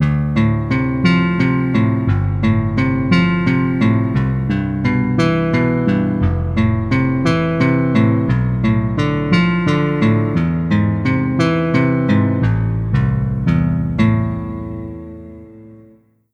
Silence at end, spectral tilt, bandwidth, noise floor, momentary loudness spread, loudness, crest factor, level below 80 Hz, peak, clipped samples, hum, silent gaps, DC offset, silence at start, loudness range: 0.6 s; -8.5 dB/octave; 8.6 kHz; -49 dBFS; 4 LU; -16 LUFS; 16 dB; -32 dBFS; 0 dBFS; under 0.1%; none; none; under 0.1%; 0 s; 2 LU